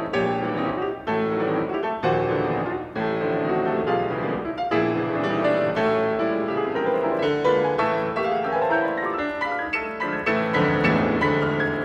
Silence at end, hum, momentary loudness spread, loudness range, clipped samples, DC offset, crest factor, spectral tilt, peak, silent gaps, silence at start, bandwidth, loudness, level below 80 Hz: 0 s; none; 5 LU; 2 LU; under 0.1%; under 0.1%; 14 dB; -7.5 dB/octave; -10 dBFS; none; 0 s; 8.8 kHz; -23 LUFS; -52 dBFS